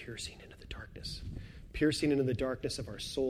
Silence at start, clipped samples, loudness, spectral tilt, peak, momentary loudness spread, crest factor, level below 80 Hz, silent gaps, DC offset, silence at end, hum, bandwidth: 0 s; under 0.1%; -35 LUFS; -5 dB/octave; -18 dBFS; 17 LU; 18 dB; -50 dBFS; none; under 0.1%; 0 s; none; 15 kHz